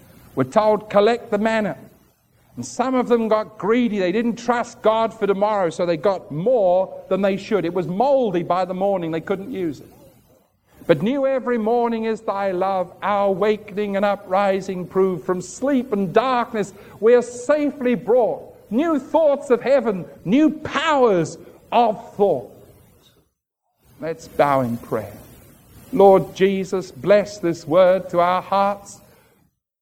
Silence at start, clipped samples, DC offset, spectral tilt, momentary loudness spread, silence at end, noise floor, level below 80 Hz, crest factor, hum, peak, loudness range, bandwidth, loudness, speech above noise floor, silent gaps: 0.35 s; under 0.1%; under 0.1%; -6 dB/octave; 10 LU; 0.85 s; -74 dBFS; -58 dBFS; 18 dB; none; -2 dBFS; 4 LU; 16 kHz; -20 LUFS; 55 dB; none